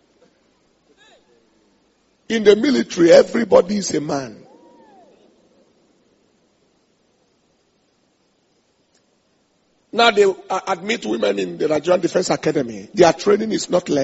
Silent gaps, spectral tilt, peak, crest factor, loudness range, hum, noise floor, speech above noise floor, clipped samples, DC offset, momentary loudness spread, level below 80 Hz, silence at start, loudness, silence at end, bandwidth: none; -3.5 dB/octave; 0 dBFS; 20 dB; 7 LU; none; -63 dBFS; 46 dB; under 0.1%; under 0.1%; 12 LU; -58 dBFS; 2.3 s; -17 LUFS; 0 s; 8 kHz